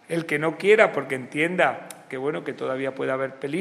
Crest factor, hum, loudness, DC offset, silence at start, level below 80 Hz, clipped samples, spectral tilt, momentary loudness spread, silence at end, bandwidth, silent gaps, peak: 22 dB; none; -24 LUFS; under 0.1%; 0.1 s; -74 dBFS; under 0.1%; -5.5 dB/octave; 12 LU; 0 s; 13 kHz; none; -2 dBFS